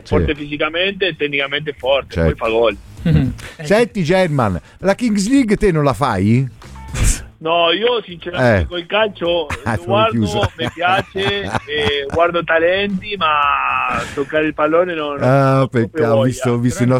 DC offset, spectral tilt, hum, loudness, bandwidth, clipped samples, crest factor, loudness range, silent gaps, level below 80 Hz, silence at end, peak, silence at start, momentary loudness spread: under 0.1%; -5.5 dB/octave; none; -16 LUFS; 15.5 kHz; under 0.1%; 14 dB; 2 LU; none; -32 dBFS; 0 s; -2 dBFS; 0.05 s; 6 LU